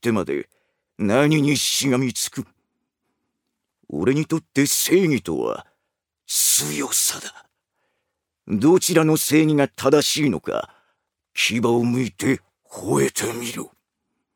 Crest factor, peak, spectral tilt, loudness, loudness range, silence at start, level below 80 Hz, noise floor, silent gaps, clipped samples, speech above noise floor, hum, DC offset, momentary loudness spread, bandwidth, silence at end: 18 dB; -4 dBFS; -4 dB/octave; -20 LUFS; 4 LU; 0.05 s; -60 dBFS; -79 dBFS; none; under 0.1%; 59 dB; none; under 0.1%; 15 LU; over 20 kHz; 0.7 s